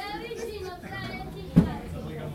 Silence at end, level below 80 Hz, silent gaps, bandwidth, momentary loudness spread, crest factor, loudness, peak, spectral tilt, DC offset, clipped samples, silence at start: 0 s; -44 dBFS; none; 15.5 kHz; 13 LU; 26 dB; -30 LUFS; -4 dBFS; -7 dB/octave; under 0.1%; under 0.1%; 0 s